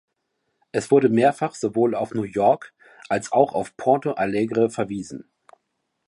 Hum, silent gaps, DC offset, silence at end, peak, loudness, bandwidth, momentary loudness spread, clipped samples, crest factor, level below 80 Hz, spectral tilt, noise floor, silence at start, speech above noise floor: none; none; under 0.1%; 0.9 s; -2 dBFS; -22 LUFS; 11.5 kHz; 10 LU; under 0.1%; 20 dB; -62 dBFS; -6.5 dB/octave; -76 dBFS; 0.75 s; 55 dB